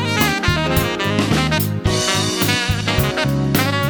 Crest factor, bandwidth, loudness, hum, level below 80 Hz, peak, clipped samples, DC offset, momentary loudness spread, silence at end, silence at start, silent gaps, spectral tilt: 16 dB; over 20 kHz; -17 LUFS; none; -32 dBFS; -2 dBFS; under 0.1%; under 0.1%; 2 LU; 0 s; 0 s; none; -4.5 dB/octave